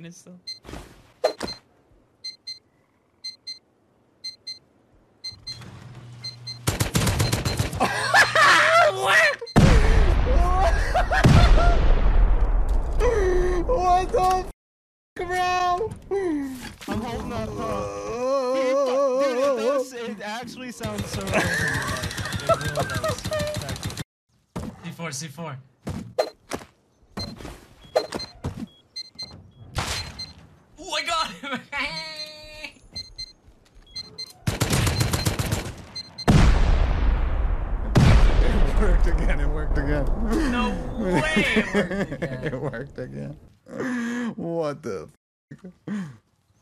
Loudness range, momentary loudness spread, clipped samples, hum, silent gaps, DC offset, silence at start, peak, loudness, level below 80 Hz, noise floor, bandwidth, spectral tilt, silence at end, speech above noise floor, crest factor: 15 LU; 19 LU; under 0.1%; none; 14.54-15.16 s, 24.05-24.27 s, 45.17-45.48 s; under 0.1%; 0 s; -6 dBFS; -23 LUFS; -26 dBFS; -63 dBFS; 14.5 kHz; -5 dB/octave; 0.5 s; 35 dB; 18 dB